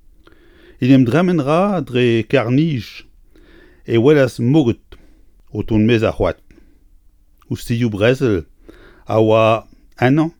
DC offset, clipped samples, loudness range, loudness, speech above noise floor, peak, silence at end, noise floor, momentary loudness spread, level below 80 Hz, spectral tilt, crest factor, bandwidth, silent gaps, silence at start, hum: under 0.1%; under 0.1%; 4 LU; -16 LUFS; 35 dB; 0 dBFS; 0.1 s; -50 dBFS; 13 LU; -42 dBFS; -7.5 dB/octave; 16 dB; 18.5 kHz; none; 0.8 s; none